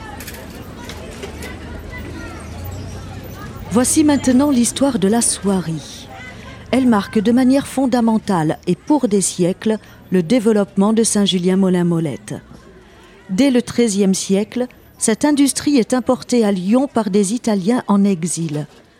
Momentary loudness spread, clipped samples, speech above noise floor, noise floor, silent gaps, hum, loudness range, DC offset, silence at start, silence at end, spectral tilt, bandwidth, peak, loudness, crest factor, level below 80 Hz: 17 LU; under 0.1%; 28 dB; -43 dBFS; none; none; 3 LU; under 0.1%; 0 s; 0.35 s; -5 dB/octave; 16 kHz; -2 dBFS; -16 LUFS; 16 dB; -42 dBFS